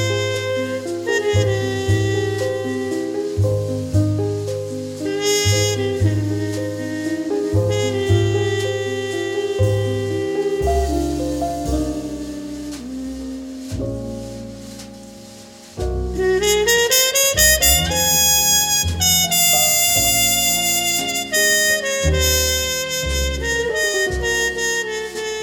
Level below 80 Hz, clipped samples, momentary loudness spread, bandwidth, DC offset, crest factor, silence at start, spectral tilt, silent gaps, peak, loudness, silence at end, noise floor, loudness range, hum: -32 dBFS; under 0.1%; 16 LU; 17.5 kHz; under 0.1%; 18 dB; 0 s; -3 dB/octave; none; -2 dBFS; -17 LUFS; 0 s; -40 dBFS; 12 LU; none